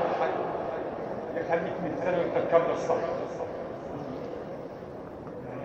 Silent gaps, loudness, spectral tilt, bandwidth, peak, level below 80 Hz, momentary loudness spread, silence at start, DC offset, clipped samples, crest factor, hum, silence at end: none; -31 LUFS; -7 dB/octave; 7.8 kHz; -8 dBFS; -60 dBFS; 15 LU; 0 s; under 0.1%; under 0.1%; 22 dB; none; 0 s